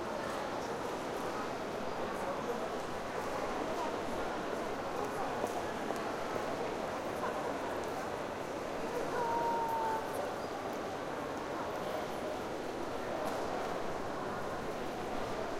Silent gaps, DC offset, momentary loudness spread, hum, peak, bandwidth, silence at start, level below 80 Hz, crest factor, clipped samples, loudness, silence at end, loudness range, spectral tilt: none; under 0.1%; 4 LU; none; -20 dBFS; 16.5 kHz; 0 s; -58 dBFS; 18 dB; under 0.1%; -38 LUFS; 0 s; 2 LU; -4.5 dB/octave